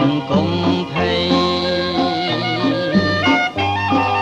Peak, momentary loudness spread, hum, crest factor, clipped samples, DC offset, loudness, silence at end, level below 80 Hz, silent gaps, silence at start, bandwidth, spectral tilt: -4 dBFS; 3 LU; none; 14 dB; under 0.1%; under 0.1%; -17 LUFS; 0 s; -46 dBFS; none; 0 s; 9.2 kHz; -6 dB/octave